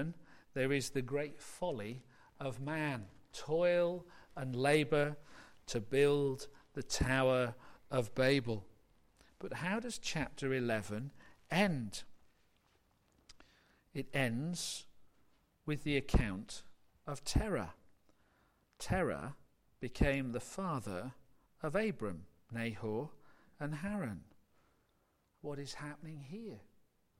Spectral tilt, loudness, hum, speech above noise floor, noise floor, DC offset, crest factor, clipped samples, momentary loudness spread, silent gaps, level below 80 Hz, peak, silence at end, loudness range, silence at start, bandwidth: -5 dB/octave; -37 LUFS; none; 40 dB; -76 dBFS; under 0.1%; 22 dB; under 0.1%; 17 LU; none; -50 dBFS; -18 dBFS; 0.55 s; 8 LU; 0 s; 16 kHz